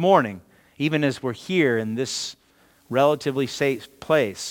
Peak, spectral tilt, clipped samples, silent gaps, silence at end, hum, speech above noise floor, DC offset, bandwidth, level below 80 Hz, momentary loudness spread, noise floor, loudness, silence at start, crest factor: -2 dBFS; -5 dB/octave; under 0.1%; none; 0 s; none; 36 dB; under 0.1%; 18 kHz; -66 dBFS; 10 LU; -58 dBFS; -23 LUFS; 0 s; 20 dB